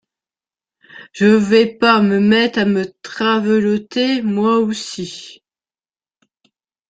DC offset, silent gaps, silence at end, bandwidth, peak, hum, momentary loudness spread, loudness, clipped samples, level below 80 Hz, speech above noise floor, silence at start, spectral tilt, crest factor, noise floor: under 0.1%; none; 1.6 s; 9 kHz; -2 dBFS; none; 14 LU; -15 LUFS; under 0.1%; -58 dBFS; over 75 dB; 0.95 s; -5.5 dB/octave; 16 dB; under -90 dBFS